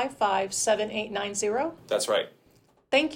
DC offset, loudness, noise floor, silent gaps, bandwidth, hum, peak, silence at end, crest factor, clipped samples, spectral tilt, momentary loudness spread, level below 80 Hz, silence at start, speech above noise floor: under 0.1%; -27 LUFS; -62 dBFS; none; 17 kHz; none; -10 dBFS; 0 s; 18 dB; under 0.1%; -2 dB/octave; 5 LU; -66 dBFS; 0 s; 35 dB